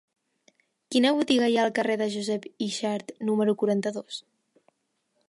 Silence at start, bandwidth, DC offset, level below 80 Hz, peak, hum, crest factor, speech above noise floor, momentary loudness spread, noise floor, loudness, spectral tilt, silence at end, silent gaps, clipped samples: 0.9 s; 11.5 kHz; under 0.1%; -76 dBFS; -10 dBFS; none; 18 dB; 50 dB; 10 LU; -75 dBFS; -26 LUFS; -4.5 dB/octave; 1.1 s; none; under 0.1%